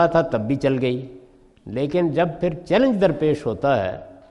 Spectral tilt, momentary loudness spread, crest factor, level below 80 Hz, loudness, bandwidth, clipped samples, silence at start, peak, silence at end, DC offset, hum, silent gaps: -8 dB/octave; 11 LU; 16 dB; -48 dBFS; -21 LUFS; 11 kHz; under 0.1%; 0 s; -4 dBFS; 0.15 s; under 0.1%; none; none